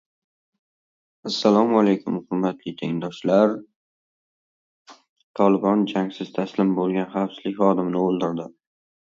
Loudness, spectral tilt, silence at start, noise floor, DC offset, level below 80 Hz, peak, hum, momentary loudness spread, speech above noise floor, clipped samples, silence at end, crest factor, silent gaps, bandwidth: -22 LUFS; -7 dB/octave; 1.25 s; under -90 dBFS; under 0.1%; -68 dBFS; -2 dBFS; none; 10 LU; over 69 dB; under 0.1%; 0.7 s; 20 dB; 3.76-4.85 s, 5.09-5.16 s, 5.23-5.34 s; 7.4 kHz